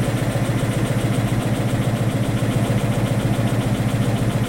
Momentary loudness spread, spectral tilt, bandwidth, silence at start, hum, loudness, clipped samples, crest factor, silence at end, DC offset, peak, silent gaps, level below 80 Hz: 1 LU; -6.5 dB/octave; 16.5 kHz; 0 s; none; -21 LUFS; under 0.1%; 12 dB; 0 s; under 0.1%; -8 dBFS; none; -36 dBFS